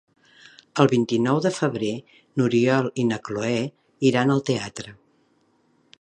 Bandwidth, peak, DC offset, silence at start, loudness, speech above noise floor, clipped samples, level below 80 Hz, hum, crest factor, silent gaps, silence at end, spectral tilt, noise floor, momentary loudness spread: 10.5 kHz; -2 dBFS; under 0.1%; 0.75 s; -23 LUFS; 42 dB; under 0.1%; -64 dBFS; none; 22 dB; none; 1.1 s; -6 dB/octave; -64 dBFS; 13 LU